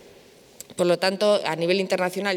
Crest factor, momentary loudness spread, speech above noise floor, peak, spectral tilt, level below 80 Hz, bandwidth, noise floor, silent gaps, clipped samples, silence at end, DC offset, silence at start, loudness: 16 dB; 10 LU; 29 dB; -8 dBFS; -4.5 dB/octave; -72 dBFS; 17.5 kHz; -51 dBFS; none; under 0.1%; 0 s; under 0.1%; 0.7 s; -22 LUFS